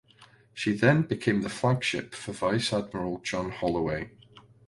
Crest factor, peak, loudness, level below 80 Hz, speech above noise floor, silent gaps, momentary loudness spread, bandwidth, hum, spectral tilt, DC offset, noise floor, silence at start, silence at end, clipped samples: 20 dB; -8 dBFS; -28 LUFS; -56 dBFS; 30 dB; none; 11 LU; 11.5 kHz; none; -5.5 dB/octave; under 0.1%; -57 dBFS; 0.2 s; 0.25 s; under 0.1%